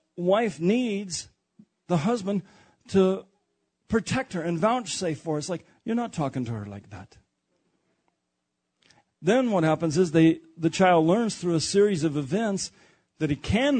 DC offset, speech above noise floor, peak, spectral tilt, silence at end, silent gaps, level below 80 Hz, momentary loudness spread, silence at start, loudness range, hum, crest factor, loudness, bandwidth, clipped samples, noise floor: under 0.1%; 55 dB; -8 dBFS; -5.5 dB/octave; 0 s; none; -54 dBFS; 13 LU; 0.15 s; 11 LU; none; 18 dB; -25 LUFS; 9.4 kHz; under 0.1%; -80 dBFS